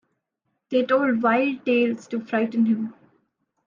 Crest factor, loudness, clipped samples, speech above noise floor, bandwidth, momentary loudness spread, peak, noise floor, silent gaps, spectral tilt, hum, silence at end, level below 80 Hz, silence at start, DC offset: 16 dB; -22 LUFS; under 0.1%; 56 dB; 7.4 kHz; 7 LU; -8 dBFS; -77 dBFS; none; -6.5 dB/octave; none; 0.75 s; -74 dBFS; 0.7 s; under 0.1%